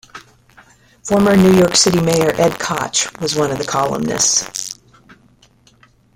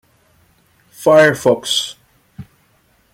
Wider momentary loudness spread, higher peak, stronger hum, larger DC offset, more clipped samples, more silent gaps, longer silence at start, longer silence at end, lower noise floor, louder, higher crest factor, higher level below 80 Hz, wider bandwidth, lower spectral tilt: first, 14 LU vs 9 LU; about the same, 0 dBFS vs 0 dBFS; neither; neither; neither; neither; second, 0.15 s vs 1 s; first, 1.45 s vs 0.7 s; second, -51 dBFS vs -57 dBFS; about the same, -14 LUFS vs -14 LUFS; about the same, 16 dB vs 16 dB; first, -46 dBFS vs -58 dBFS; about the same, 17 kHz vs 16.5 kHz; about the same, -4 dB/octave vs -3.5 dB/octave